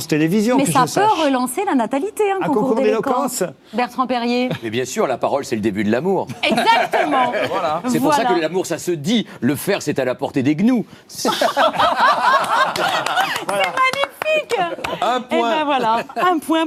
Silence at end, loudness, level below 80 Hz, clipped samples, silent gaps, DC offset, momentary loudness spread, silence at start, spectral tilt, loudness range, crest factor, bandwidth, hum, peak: 0 s; -18 LUFS; -60 dBFS; under 0.1%; none; under 0.1%; 6 LU; 0 s; -4.5 dB/octave; 3 LU; 18 dB; 16 kHz; none; 0 dBFS